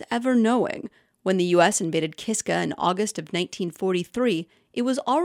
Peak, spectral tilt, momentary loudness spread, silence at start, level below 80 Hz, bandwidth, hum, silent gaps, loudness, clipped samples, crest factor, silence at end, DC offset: -6 dBFS; -4.5 dB/octave; 10 LU; 0 s; -66 dBFS; 16 kHz; none; none; -24 LUFS; under 0.1%; 18 dB; 0 s; under 0.1%